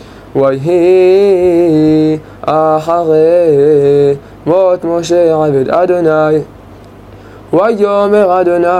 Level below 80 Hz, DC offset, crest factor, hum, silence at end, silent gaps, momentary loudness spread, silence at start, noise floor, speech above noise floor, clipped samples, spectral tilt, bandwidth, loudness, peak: -44 dBFS; under 0.1%; 10 dB; none; 0 s; none; 6 LU; 0 s; -34 dBFS; 25 dB; under 0.1%; -7.5 dB/octave; 11.5 kHz; -10 LUFS; 0 dBFS